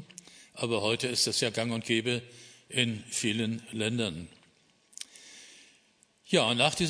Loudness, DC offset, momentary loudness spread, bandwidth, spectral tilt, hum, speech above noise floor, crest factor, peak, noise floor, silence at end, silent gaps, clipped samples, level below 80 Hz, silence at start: -29 LUFS; under 0.1%; 23 LU; 11 kHz; -3.5 dB/octave; none; 36 dB; 24 dB; -8 dBFS; -66 dBFS; 0 s; none; under 0.1%; -66 dBFS; 0 s